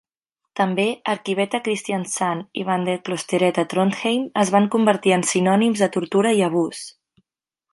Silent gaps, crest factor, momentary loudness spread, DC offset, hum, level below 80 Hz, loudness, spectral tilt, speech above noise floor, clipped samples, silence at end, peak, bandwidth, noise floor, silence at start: none; 18 dB; 7 LU; under 0.1%; none; -70 dBFS; -20 LUFS; -4.5 dB/octave; 64 dB; under 0.1%; 0.85 s; -2 dBFS; 11.5 kHz; -84 dBFS; 0.55 s